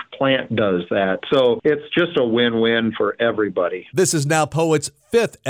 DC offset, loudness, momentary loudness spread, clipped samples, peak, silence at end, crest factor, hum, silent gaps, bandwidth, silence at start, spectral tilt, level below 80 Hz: under 0.1%; -19 LUFS; 4 LU; under 0.1%; -4 dBFS; 0 s; 14 dB; none; none; 16 kHz; 0 s; -4.5 dB/octave; -58 dBFS